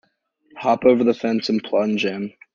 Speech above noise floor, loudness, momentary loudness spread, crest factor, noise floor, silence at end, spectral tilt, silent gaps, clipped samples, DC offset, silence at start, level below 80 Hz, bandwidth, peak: 44 dB; -20 LUFS; 9 LU; 18 dB; -63 dBFS; 0.25 s; -6 dB/octave; none; under 0.1%; under 0.1%; 0.55 s; -60 dBFS; 7.4 kHz; -2 dBFS